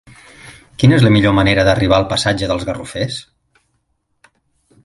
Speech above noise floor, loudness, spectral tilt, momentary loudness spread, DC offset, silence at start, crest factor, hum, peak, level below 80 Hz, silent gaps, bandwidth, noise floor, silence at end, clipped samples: 53 dB; -14 LUFS; -6 dB/octave; 12 LU; under 0.1%; 0.45 s; 16 dB; none; 0 dBFS; -36 dBFS; none; 11.5 kHz; -66 dBFS; 1.65 s; under 0.1%